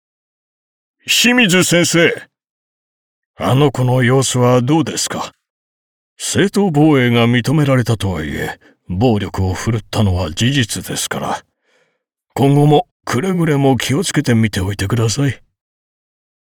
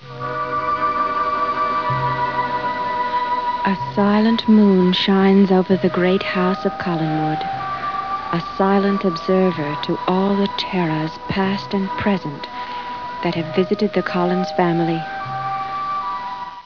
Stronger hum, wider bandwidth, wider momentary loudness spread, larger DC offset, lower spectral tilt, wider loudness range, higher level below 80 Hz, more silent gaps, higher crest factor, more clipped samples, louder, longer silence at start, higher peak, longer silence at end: neither; first, 20 kHz vs 5.4 kHz; about the same, 12 LU vs 10 LU; second, under 0.1% vs 0.4%; second, -5 dB/octave vs -7.5 dB/octave; second, 3 LU vs 6 LU; about the same, -46 dBFS vs -50 dBFS; first, 2.50-3.34 s, 5.50-6.16 s, 12.91-13.00 s vs none; about the same, 14 dB vs 16 dB; neither; first, -15 LUFS vs -19 LUFS; first, 1.05 s vs 0 s; about the same, -2 dBFS vs -2 dBFS; first, 1.15 s vs 0 s